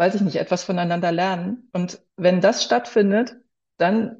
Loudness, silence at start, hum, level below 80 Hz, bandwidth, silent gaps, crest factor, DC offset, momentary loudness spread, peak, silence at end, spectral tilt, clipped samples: -21 LUFS; 0 s; none; -68 dBFS; 7.8 kHz; none; 16 dB; under 0.1%; 10 LU; -4 dBFS; 0.05 s; -5.5 dB/octave; under 0.1%